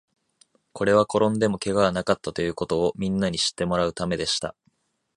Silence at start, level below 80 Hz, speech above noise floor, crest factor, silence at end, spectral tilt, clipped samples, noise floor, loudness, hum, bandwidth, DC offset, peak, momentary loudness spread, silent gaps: 0.75 s; -50 dBFS; 45 dB; 20 dB; 0.65 s; -4.5 dB/octave; under 0.1%; -68 dBFS; -24 LUFS; none; 11.5 kHz; under 0.1%; -4 dBFS; 7 LU; none